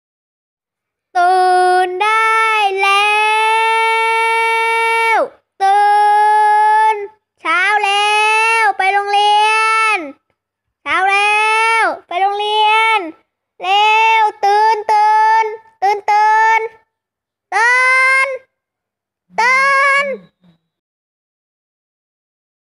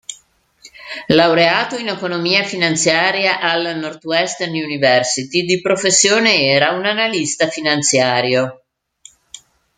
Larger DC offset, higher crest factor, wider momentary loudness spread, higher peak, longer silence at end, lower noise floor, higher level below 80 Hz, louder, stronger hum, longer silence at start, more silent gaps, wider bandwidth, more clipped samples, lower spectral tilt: neither; second, 10 dB vs 16 dB; about the same, 8 LU vs 9 LU; second, -4 dBFS vs 0 dBFS; first, 2.4 s vs 1.25 s; first, -82 dBFS vs -53 dBFS; second, -68 dBFS vs -60 dBFS; first, -12 LUFS vs -15 LUFS; neither; first, 1.15 s vs 0.1 s; neither; first, 12.5 kHz vs 9.8 kHz; neither; second, 0 dB/octave vs -2.5 dB/octave